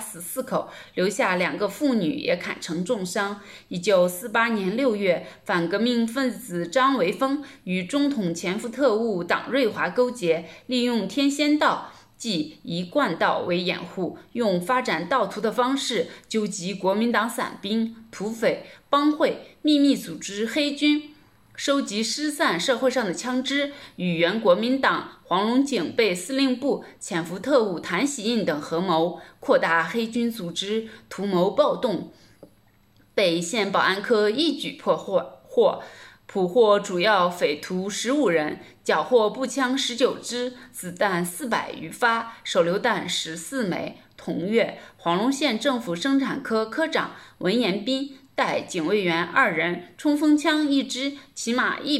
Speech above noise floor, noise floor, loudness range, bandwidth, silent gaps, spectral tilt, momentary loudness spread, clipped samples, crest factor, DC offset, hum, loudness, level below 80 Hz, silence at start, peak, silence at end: 36 dB; -59 dBFS; 2 LU; 15 kHz; none; -4 dB/octave; 9 LU; under 0.1%; 20 dB; under 0.1%; none; -24 LUFS; -68 dBFS; 0 s; -4 dBFS; 0 s